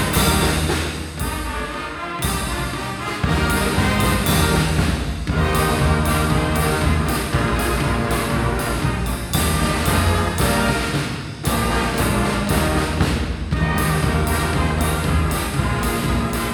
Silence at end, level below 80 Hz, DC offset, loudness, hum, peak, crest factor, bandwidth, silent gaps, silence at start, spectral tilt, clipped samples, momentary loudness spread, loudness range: 0 s; -26 dBFS; under 0.1%; -20 LUFS; none; -4 dBFS; 14 dB; 19 kHz; none; 0 s; -5 dB/octave; under 0.1%; 7 LU; 2 LU